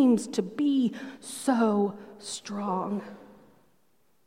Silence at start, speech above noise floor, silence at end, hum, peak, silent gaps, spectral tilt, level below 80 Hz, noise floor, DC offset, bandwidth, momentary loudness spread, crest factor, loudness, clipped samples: 0 s; 43 dB; 0.95 s; none; -10 dBFS; none; -5.5 dB/octave; -76 dBFS; -71 dBFS; under 0.1%; 15 kHz; 14 LU; 18 dB; -28 LUFS; under 0.1%